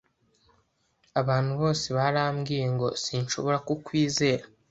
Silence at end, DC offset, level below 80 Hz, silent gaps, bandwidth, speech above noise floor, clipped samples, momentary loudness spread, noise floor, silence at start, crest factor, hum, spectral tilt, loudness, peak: 0.25 s; under 0.1%; -60 dBFS; none; 8.2 kHz; 43 dB; under 0.1%; 5 LU; -69 dBFS; 1.15 s; 18 dB; none; -5 dB/octave; -27 LUFS; -10 dBFS